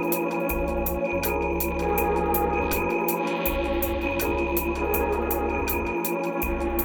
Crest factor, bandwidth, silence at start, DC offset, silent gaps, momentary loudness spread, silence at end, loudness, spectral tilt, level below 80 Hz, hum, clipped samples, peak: 14 dB; over 20 kHz; 0 s; under 0.1%; none; 3 LU; 0 s; -25 LUFS; -5.5 dB/octave; -34 dBFS; none; under 0.1%; -12 dBFS